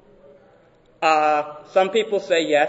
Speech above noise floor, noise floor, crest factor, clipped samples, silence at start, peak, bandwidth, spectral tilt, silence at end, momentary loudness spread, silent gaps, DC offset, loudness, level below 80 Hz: 35 dB; -54 dBFS; 18 dB; under 0.1%; 1 s; -4 dBFS; 8 kHz; -3.5 dB/octave; 0 s; 5 LU; none; under 0.1%; -20 LUFS; -66 dBFS